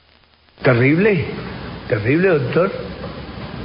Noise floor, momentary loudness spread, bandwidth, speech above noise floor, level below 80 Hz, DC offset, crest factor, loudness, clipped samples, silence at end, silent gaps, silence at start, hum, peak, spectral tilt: -53 dBFS; 17 LU; 5.4 kHz; 37 dB; -42 dBFS; under 0.1%; 16 dB; -17 LUFS; under 0.1%; 0 s; none; 0.6 s; none; -2 dBFS; -12.5 dB/octave